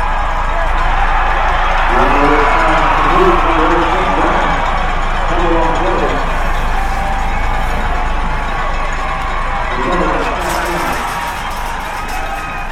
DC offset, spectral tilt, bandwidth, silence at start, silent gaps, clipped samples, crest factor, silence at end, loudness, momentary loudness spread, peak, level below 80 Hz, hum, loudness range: under 0.1%; -5 dB/octave; 14.5 kHz; 0 s; none; under 0.1%; 12 dB; 0 s; -15 LUFS; 8 LU; 0 dBFS; -16 dBFS; none; 6 LU